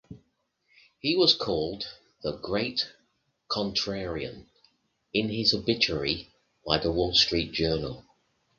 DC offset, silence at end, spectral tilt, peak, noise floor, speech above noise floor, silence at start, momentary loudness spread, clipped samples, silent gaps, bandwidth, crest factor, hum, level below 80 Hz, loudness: under 0.1%; 0.6 s; -4.5 dB/octave; -4 dBFS; -73 dBFS; 45 dB; 0.1 s; 14 LU; under 0.1%; none; 7.4 kHz; 26 dB; none; -50 dBFS; -27 LUFS